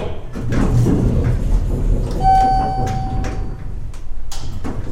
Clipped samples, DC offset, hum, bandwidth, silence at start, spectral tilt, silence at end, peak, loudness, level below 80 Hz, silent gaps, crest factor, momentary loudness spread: under 0.1%; under 0.1%; none; 11.5 kHz; 0 s; -7.5 dB/octave; 0 s; -2 dBFS; -19 LUFS; -22 dBFS; none; 14 dB; 17 LU